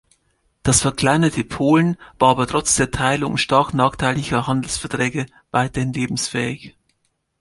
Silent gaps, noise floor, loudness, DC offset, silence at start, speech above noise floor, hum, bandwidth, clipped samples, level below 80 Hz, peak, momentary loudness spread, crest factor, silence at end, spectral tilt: none; -69 dBFS; -19 LUFS; under 0.1%; 0.65 s; 51 dB; none; 11.5 kHz; under 0.1%; -42 dBFS; -2 dBFS; 7 LU; 18 dB; 0.7 s; -4 dB/octave